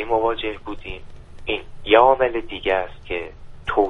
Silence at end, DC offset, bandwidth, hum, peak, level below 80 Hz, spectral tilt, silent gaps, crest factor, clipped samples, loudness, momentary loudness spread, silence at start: 0 s; under 0.1%; 9.2 kHz; none; 0 dBFS; -40 dBFS; -6.5 dB/octave; none; 20 dB; under 0.1%; -21 LUFS; 19 LU; 0 s